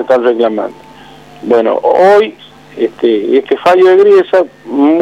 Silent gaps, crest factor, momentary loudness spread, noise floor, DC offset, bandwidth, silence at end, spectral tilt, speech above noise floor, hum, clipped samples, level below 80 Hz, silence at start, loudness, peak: none; 10 dB; 11 LU; -35 dBFS; 0.2%; 8.8 kHz; 0 s; -6 dB/octave; 26 dB; none; under 0.1%; -56 dBFS; 0 s; -10 LUFS; 0 dBFS